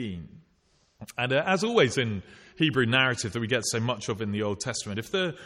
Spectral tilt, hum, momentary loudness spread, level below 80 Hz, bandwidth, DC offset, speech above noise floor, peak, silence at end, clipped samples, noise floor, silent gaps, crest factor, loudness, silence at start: -4 dB/octave; none; 10 LU; -60 dBFS; 14 kHz; under 0.1%; 40 dB; -8 dBFS; 0 s; under 0.1%; -67 dBFS; none; 20 dB; -26 LUFS; 0 s